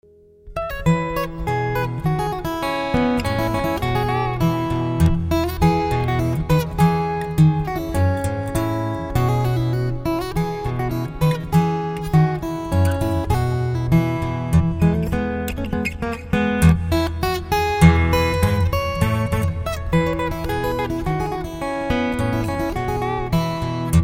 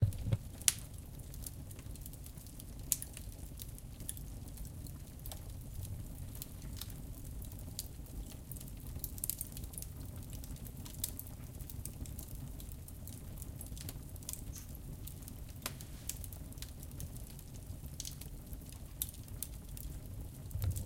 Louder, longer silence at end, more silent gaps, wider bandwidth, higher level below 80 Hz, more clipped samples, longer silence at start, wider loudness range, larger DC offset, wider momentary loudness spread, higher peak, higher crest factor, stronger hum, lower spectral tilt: first, -21 LUFS vs -44 LUFS; about the same, 0 s vs 0 s; neither; about the same, 16.5 kHz vs 17 kHz; first, -30 dBFS vs -50 dBFS; neither; first, 0.45 s vs 0 s; about the same, 4 LU vs 4 LU; neither; second, 7 LU vs 10 LU; about the same, 0 dBFS vs -2 dBFS; second, 18 dB vs 42 dB; neither; first, -7 dB/octave vs -3.5 dB/octave